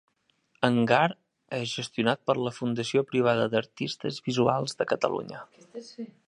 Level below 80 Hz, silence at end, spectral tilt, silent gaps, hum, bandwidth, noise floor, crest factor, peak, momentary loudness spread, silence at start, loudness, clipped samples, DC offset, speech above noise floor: -68 dBFS; 0.25 s; -5.5 dB/octave; none; none; 11 kHz; -70 dBFS; 22 dB; -6 dBFS; 18 LU; 0.6 s; -27 LUFS; under 0.1%; under 0.1%; 42 dB